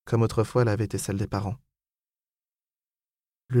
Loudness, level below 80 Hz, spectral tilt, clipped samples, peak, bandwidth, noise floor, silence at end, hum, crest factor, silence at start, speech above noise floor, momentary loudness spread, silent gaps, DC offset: -27 LUFS; -52 dBFS; -7 dB/octave; under 0.1%; -12 dBFS; 14.5 kHz; under -90 dBFS; 0 s; none; 16 dB; 0.05 s; over 65 dB; 9 LU; none; under 0.1%